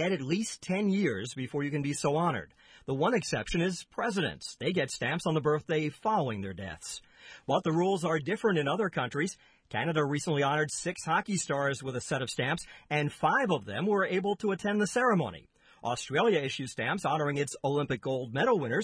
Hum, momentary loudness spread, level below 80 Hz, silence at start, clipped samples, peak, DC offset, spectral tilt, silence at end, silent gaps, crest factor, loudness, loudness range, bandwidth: none; 8 LU; -60 dBFS; 0 s; under 0.1%; -14 dBFS; under 0.1%; -5 dB/octave; 0 s; none; 16 dB; -30 LUFS; 2 LU; 11 kHz